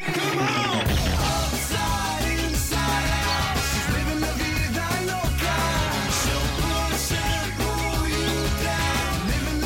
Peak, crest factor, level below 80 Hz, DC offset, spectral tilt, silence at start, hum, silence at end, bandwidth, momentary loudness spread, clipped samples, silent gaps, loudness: -12 dBFS; 12 dB; -30 dBFS; under 0.1%; -4 dB/octave; 0 s; none; 0 s; 17 kHz; 2 LU; under 0.1%; none; -24 LUFS